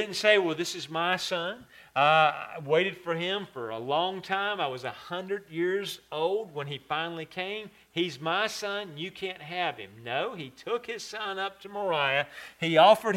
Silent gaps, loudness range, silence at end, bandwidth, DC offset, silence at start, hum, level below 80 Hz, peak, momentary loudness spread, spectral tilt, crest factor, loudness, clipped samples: none; 6 LU; 0 s; 16 kHz; under 0.1%; 0 s; none; -72 dBFS; -6 dBFS; 14 LU; -4 dB/octave; 22 dB; -29 LUFS; under 0.1%